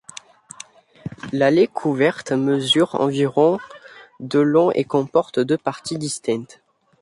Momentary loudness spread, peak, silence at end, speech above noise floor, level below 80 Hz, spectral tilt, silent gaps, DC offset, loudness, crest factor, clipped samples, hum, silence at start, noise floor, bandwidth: 22 LU; -4 dBFS; 0.55 s; 25 dB; -62 dBFS; -5 dB/octave; none; under 0.1%; -19 LUFS; 16 dB; under 0.1%; none; 1.05 s; -44 dBFS; 11.5 kHz